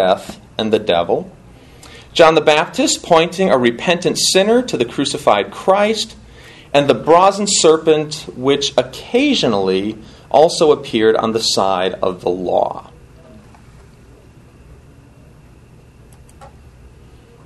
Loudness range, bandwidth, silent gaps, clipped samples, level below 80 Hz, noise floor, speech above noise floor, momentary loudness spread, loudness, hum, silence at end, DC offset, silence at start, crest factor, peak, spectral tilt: 6 LU; 12.5 kHz; none; under 0.1%; -48 dBFS; -43 dBFS; 29 dB; 9 LU; -15 LUFS; none; 0.95 s; under 0.1%; 0 s; 16 dB; 0 dBFS; -3.5 dB/octave